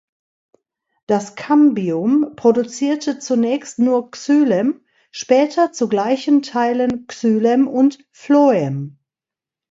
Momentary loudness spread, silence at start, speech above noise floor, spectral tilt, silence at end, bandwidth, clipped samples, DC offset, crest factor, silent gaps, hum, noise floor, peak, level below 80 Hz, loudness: 8 LU; 1.1 s; 72 dB; -6 dB/octave; 0.85 s; 7.8 kHz; under 0.1%; under 0.1%; 16 dB; none; none; -88 dBFS; 0 dBFS; -64 dBFS; -17 LUFS